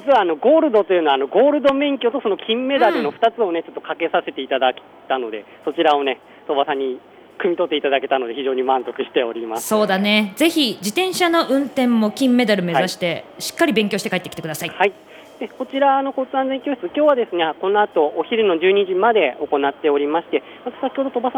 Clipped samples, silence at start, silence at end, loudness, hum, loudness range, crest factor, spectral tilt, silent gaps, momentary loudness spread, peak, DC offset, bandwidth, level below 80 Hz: under 0.1%; 0 s; 0 s; -19 LUFS; none; 4 LU; 16 dB; -4.5 dB/octave; none; 10 LU; -2 dBFS; under 0.1%; 19.5 kHz; -66 dBFS